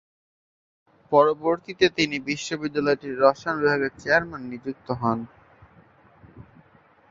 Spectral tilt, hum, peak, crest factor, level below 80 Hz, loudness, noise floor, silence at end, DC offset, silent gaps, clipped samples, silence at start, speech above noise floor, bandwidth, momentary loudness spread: -5 dB/octave; none; -2 dBFS; 22 dB; -60 dBFS; -24 LUFS; -57 dBFS; 0.7 s; under 0.1%; none; under 0.1%; 1.1 s; 34 dB; 7.6 kHz; 13 LU